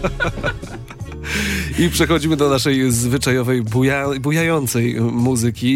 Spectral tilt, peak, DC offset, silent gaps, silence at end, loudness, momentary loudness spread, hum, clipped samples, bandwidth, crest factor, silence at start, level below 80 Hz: -5 dB/octave; -4 dBFS; under 0.1%; none; 0 s; -18 LUFS; 9 LU; none; under 0.1%; 16.5 kHz; 14 dB; 0 s; -34 dBFS